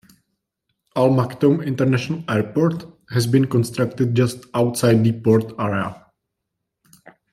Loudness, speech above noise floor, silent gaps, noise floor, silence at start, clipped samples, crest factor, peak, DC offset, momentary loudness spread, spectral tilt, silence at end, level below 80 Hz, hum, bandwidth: -20 LUFS; 61 dB; none; -79 dBFS; 0.95 s; under 0.1%; 18 dB; -2 dBFS; under 0.1%; 7 LU; -7 dB/octave; 1.4 s; -58 dBFS; none; 14 kHz